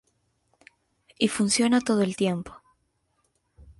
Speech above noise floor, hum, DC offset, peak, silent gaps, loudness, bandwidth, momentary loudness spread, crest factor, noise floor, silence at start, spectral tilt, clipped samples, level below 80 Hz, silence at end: 49 dB; none; under 0.1%; -8 dBFS; none; -24 LUFS; 11.5 kHz; 9 LU; 20 dB; -72 dBFS; 1.2 s; -4 dB/octave; under 0.1%; -60 dBFS; 1.25 s